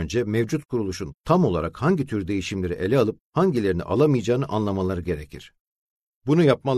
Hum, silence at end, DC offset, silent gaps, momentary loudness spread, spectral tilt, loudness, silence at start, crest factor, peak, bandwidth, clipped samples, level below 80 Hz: none; 0 s; under 0.1%; 1.20-1.24 s, 3.21-3.30 s, 5.59-5.96 s, 6.02-6.21 s; 10 LU; -7 dB/octave; -23 LUFS; 0 s; 18 dB; -6 dBFS; 13.5 kHz; under 0.1%; -46 dBFS